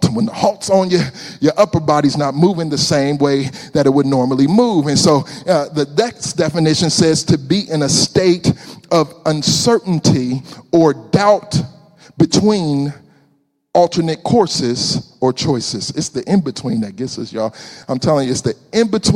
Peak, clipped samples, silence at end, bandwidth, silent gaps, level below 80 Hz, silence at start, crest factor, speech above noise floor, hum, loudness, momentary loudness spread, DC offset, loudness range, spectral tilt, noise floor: 0 dBFS; under 0.1%; 0 s; 15 kHz; none; -48 dBFS; 0 s; 14 dB; 45 dB; none; -15 LUFS; 8 LU; under 0.1%; 4 LU; -5 dB/octave; -60 dBFS